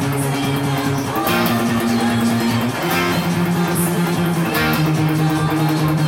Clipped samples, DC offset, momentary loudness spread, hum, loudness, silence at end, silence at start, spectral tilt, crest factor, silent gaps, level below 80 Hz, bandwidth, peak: under 0.1%; under 0.1%; 3 LU; none; -18 LUFS; 0 s; 0 s; -5.5 dB/octave; 14 dB; none; -46 dBFS; 17 kHz; -4 dBFS